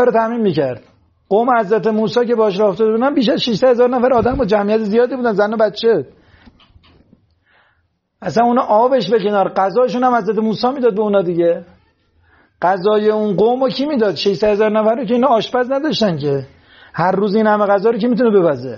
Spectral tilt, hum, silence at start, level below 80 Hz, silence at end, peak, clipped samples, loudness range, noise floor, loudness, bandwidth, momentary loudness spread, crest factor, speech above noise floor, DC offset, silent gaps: -4.5 dB/octave; none; 0 s; -48 dBFS; 0 s; -2 dBFS; under 0.1%; 4 LU; -64 dBFS; -15 LUFS; 7.2 kHz; 5 LU; 14 dB; 49 dB; under 0.1%; none